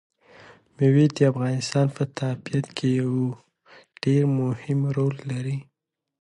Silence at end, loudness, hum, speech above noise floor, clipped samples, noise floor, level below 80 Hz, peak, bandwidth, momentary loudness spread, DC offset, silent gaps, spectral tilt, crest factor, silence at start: 0.6 s; -24 LUFS; none; 31 dB; under 0.1%; -54 dBFS; -66 dBFS; -6 dBFS; 10.5 kHz; 10 LU; under 0.1%; none; -7.5 dB/octave; 18 dB; 0.8 s